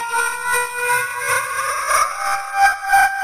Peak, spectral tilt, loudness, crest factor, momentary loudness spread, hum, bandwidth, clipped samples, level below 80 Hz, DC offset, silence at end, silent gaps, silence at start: -2 dBFS; 1 dB/octave; -18 LUFS; 16 dB; 6 LU; none; 15.5 kHz; under 0.1%; -50 dBFS; under 0.1%; 0 s; none; 0 s